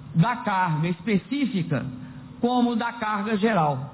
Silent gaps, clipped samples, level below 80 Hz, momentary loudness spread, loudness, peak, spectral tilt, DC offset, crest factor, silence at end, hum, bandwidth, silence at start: none; under 0.1%; -56 dBFS; 7 LU; -24 LUFS; -10 dBFS; -11 dB/octave; under 0.1%; 14 dB; 0 s; none; 4 kHz; 0 s